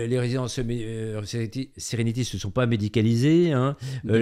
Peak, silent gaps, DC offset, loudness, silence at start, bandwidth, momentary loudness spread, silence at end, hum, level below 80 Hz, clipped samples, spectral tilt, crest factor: -8 dBFS; none; under 0.1%; -25 LUFS; 0 s; 14 kHz; 12 LU; 0 s; none; -48 dBFS; under 0.1%; -6.5 dB/octave; 16 dB